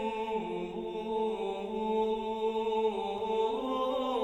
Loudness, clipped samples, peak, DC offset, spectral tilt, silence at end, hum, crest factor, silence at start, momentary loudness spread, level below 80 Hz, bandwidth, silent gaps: -33 LUFS; under 0.1%; -18 dBFS; under 0.1%; -6 dB/octave; 0 s; none; 14 dB; 0 s; 5 LU; -60 dBFS; 9 kHz; none